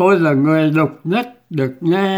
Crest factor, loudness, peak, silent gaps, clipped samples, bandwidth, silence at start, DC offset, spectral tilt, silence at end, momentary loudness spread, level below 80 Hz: 14 dB; -16 LUFS; -2 dBFS; none; under 0.1%; over 20 kHz; 0 s; under 0.1%; -8 dB/octave; 0 s; 8 LU; -62 dBFS